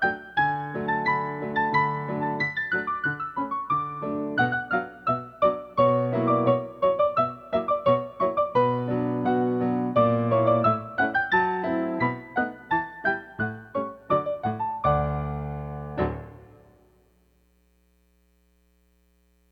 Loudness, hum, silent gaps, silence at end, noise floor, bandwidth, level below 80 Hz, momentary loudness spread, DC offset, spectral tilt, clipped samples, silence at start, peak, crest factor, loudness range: -25 LUFS; none; none; 3.1 s; -64 dBFS; 6.2 kHz; -50 dBFS; 8 LU; under 0.1%; -9 dB/octave; under 0.1%; 0 s; -8 dBFS; 18 dB; 7 LU